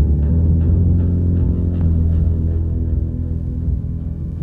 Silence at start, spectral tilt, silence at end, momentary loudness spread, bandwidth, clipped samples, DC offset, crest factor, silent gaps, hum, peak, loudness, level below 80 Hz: 0 s; -12.5 dB/octave; 0 s; 8 LU; 1.8 kHz; under 0.1%; under 0.1%; 12 dB; none; none; -4 dBFS; -18 LUFS; -20 dBFS